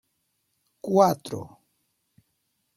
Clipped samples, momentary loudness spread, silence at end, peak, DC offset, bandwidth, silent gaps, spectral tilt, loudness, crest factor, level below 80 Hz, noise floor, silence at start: under 0.1%; 20 LU; 1.3 s; -6 dBFS; under 0.1%; 16.5 kHz; none; -6.5 dB/octave; -23 LUFS; 24 dB; -68 dBFS; -75 dBFS; 0.85 s